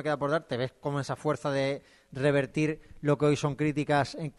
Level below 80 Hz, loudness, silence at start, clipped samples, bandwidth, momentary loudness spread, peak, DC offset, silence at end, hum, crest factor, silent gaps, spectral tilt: -60 dBFS; -29 LUFS; 0 s; under 0.1%; 11.5 kHz; 7 LU; -14 dBFS; under 0.1%; 0.05 s; none; 16 dB; none; -6.5 dB/octave